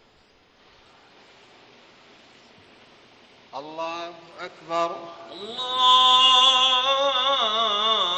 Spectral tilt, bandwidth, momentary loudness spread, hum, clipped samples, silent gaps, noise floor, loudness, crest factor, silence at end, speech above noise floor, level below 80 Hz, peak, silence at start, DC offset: -0.5 dB/octave; 8.6 kHz; 25 LU; none; under 0.1%; none; -58 dBFS; -18 LUFS; 18 dB; 0 s; 37 dB; -70 dBFS; -6 dBFS; 3.55 s; under 0.1%